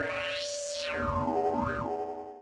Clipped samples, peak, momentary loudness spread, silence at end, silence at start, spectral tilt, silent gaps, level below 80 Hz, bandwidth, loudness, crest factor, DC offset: under 0.1%; -18 dBFS; 5 LU; 0 s; 0 s; -4 dB/octave; none; -52 dBFS; 11.5 kHz; -32 LUFS; 14 dB; under 0.1%